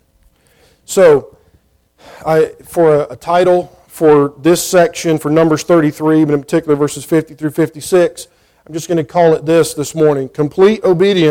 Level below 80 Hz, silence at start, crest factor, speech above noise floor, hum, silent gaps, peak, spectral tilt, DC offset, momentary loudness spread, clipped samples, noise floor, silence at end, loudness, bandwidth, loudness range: -50 dBFS; 0.9 s; 12 dB; 42 dB; none; none; 0 dBFS; -5.5 dB/octave; under 0.1%; 7 LU; under 0.1%; -54 dBFS; 0 s; -13 LUFS; 17 kHz; 3 LU